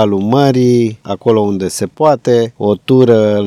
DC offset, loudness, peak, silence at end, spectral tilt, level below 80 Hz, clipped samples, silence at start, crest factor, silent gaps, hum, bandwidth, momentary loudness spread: under 0.1%; -12 LUFS; 0 dBFS; 0 s; -7 dB/octave; -56 dBFS; 0.4%; 0 s; 12 dB; none; none; 14 kHz; 8 LU